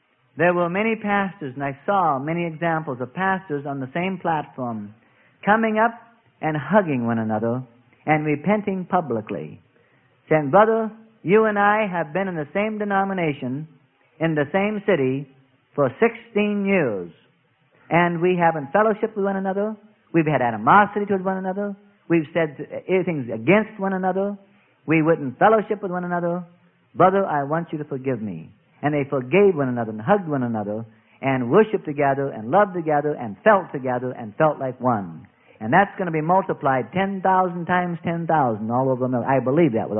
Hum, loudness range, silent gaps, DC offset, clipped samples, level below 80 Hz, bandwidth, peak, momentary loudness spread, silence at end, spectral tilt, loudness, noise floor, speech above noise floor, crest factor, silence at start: none; 3 LU; none; under 0.1%; under 0.1%; -62 dBFS; 3.6 kHz; -2 dBFS; 11 LU; 0 s; -12 dB/octave; -22 LUFS; -62 dBFS; 41 dB; 20 dB; 0.35 s